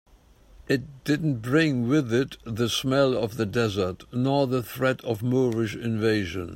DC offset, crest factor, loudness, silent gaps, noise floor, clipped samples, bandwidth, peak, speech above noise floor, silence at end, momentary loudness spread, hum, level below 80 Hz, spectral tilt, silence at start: under 0.1%; 16 dB; -25 LUFS; none; -54 dBFS; under 0.1%; 16.5 kHz; -8 dBFS; 29 dB; 0 s; 6 LU; none; -54 dBFS; -6 dB/octave; 0.55 s